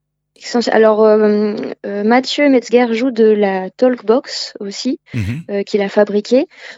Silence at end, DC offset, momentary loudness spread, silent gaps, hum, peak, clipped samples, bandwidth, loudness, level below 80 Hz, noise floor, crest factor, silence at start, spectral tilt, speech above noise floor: 0.05 s; under 0.1%; 11 LU; none; none; 0 dBFS; under 0.1%; 8 kHz; -14 LUFS; -56 dBFS; -35 dBFS; 14 dB; 0.4 s; -5.5 dB/octave; 21 dB